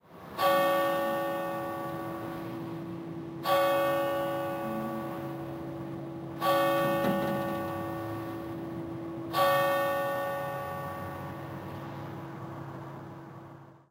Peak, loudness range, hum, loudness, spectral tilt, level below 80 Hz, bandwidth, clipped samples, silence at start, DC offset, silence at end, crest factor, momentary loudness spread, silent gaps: -14 dBFS; 5 LU; none; -32 LUFS; -5.5 dB/octave; -64 dBFS; 16 kHz; under 0.1%; 0.1 s; under 0.1%; 0.15 s; 18 dB; 15 LU; none